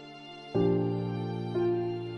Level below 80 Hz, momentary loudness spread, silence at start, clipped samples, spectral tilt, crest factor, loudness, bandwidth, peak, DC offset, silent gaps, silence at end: -58 dBFS; 10 LU; 0 s; under 0.1%; -9.5 dB/octave; 14 dB; -30 LUFS; 6.6 kHz; -16 dBFS; under 0.1%; none; 0 s